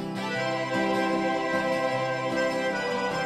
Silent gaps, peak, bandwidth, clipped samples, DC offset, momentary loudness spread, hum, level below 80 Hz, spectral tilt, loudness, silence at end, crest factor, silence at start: none; -14 dBFS; 13.5 kHz; under 0.1%; under 0.1%; 3 LU; none; -64 dBFS; -5 dB/octave; -27 LUFS; 0 s; 14 dB; 0 s